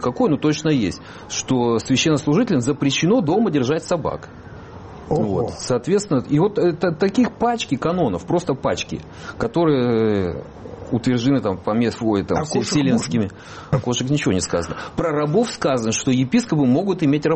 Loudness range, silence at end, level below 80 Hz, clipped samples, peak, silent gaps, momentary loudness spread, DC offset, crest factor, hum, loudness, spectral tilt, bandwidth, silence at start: 2 LU; 0 s; -48 dBFS; under 0.1%; -6 dBFS; none; 10 LU; under 0.1%; 14 dB; none; -20 LUFS; -5.5 dB/octave; 8.8 kHz; 0 s